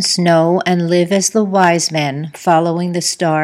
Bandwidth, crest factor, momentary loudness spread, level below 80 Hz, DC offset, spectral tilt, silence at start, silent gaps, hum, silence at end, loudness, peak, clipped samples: 15 kHz; 14 dB; 5 LU; -66 dBFS; under 0.1%; -4.5 dB/octave; 0 s; none; none; 0 s; -14 LUFS; 0 dBFS; under 0.1%